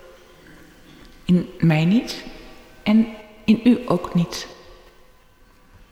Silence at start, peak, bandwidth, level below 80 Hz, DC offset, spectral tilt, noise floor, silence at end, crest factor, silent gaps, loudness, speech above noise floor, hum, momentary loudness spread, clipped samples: 1.3 s; -6 dBFS; 14 kHz; -48 dBFS; under 0.1%; -7 dB/octave; -52 dBFS; 1.4 s; 16 dB; none; -20 LUFS; 33 dB; none; 16 LU; under 0.1%